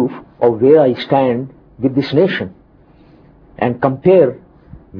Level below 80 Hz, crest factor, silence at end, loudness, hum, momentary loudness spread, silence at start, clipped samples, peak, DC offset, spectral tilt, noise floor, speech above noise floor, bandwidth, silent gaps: -50 dBFS; 16 dB; 0 s; -14 LUFS; none; 12 LU; 0 s; under 0.1%; 0 dBFS; under 0.1%; -9.5 dB/octave; -46 dBFS; 34 dB; 5.4 kHz; none